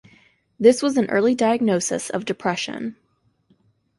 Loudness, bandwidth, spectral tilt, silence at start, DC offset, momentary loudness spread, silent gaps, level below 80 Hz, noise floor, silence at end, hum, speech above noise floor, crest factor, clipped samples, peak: -20 LUFS; 11.5 kHz; -4.5 dB/octave; 0.6 s; under 0.1%; 11 LU; none; -64 dBFS; -64 dBFS; 1.05 s; none; 44 dB; 20 dB; under 0.1%; -2 dBFS